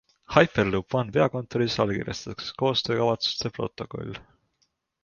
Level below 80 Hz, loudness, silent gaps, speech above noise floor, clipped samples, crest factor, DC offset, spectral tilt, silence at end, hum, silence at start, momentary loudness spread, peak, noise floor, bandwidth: -54 dBFS; -26 LUFS; none; 47 dB; under 0.1%; 24 dB; under 0.1%; -5.5 dB/octave; 0.8 s; none; 0.3 s; 13 LU; -2 dBFS; -73 dBFS; 7.2 kHz